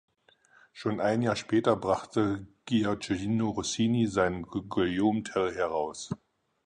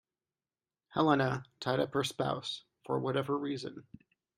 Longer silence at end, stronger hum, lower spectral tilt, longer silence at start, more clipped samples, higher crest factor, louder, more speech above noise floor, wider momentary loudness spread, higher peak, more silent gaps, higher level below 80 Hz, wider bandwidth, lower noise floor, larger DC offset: about the same, 0.5 s vs 0.55 s; neither; about the same, -5.5 dB/octave vs -5.5 dB/octave; second, 0.75 s vs 0.9 s; neither; about the same, 20 dB vs 22 dB; first, -29 LUFS vs -33 LUFS; second, 35 dB vs over 57 dB; second, 9 LU vs 12 LU; about the same, -10 dBFS vs -12 dBFS; neither; first, -56 dBFS vs -70 dBFS; second, 10 kHz vs 15.5 kHz; second, -63 dBFS vs under -90 dBFS; neither